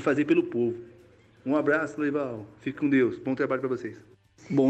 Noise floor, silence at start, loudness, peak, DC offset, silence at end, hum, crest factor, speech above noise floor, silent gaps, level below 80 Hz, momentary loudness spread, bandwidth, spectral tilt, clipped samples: -56 dBFS; 0 s; -27 LUFS; -12 dBFS; under 0.1%; 0 s; none; 14 dB; 29 dB; none; -68 dBFS; 12 LU; 8.4 kHz; -7.5 dB/octave; under 0.1%